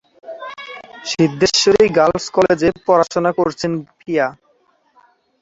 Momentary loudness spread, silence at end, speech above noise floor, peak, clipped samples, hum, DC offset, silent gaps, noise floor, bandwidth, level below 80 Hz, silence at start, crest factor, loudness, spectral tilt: 19 LU; 1.1 s; 43 dB; 0 dBFS; under 0.1%; none; under 0.1%; none; -59 dBFS; 8 kHz; -50 dBFS; 0.25 s; 16 dB; -16 LUFS; -4.5 dB/octave